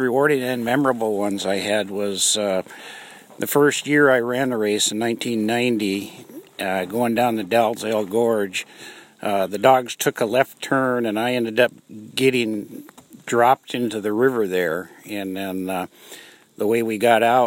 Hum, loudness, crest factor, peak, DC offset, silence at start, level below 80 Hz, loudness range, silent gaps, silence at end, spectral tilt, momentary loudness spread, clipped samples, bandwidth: none; -21 LUFS; 20 dB; 0 dBFS; under 0.1%; 0 s; -70 dBFS; 3 LU; none; 0 s; -4 dB/octave; 18 LU; under 0.1%; 16.5 kHz